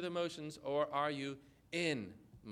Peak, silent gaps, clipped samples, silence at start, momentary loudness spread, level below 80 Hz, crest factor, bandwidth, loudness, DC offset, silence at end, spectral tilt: -24 dBFS; none; under 0.1%; 0 s; 15 LU; -74 dBFS; 16 dB; 14.5 kHz; -39 LUFS; under 0.1%; 0 s; -5 dB/octave